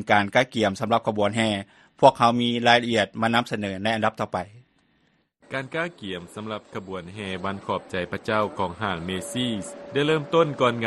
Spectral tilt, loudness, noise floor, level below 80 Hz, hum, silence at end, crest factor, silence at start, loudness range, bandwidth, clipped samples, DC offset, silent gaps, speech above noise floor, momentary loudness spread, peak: -5 dB/octave; -24 LUFS; -66 dBFS; -60 dBFS; none; 0 s; 24 dB; 0 s; 11 LU; 12.5 kHz; under 0.1%; under 0.1%; none; 42 dB; 15 LU; 0 dBFS